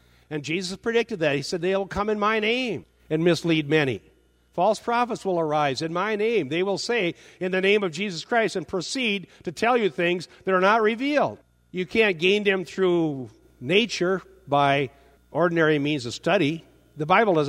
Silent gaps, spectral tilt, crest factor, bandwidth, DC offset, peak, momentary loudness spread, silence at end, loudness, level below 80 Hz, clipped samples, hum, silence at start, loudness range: none; -5 dB/octave; 20 dB; 13.5 kHz; under 0.1%; -4 dBFS; 10 LU; 0 s; -24 LUFS; -58 dBFS; under 0.1%; none; 0.3 s; 2 LU